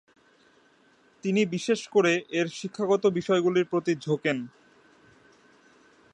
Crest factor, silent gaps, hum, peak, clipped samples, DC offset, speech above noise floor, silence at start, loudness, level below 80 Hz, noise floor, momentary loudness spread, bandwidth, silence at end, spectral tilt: 18 dB; none; none; -10 dBFS; under 0.1%; under 0.1%; 36 dB; 1.25 s; -26 LUFS; -74 dBFS; -61 dBFS; 8 LU; 10.5 kHz; 1.65 s; -5.5 dB/octave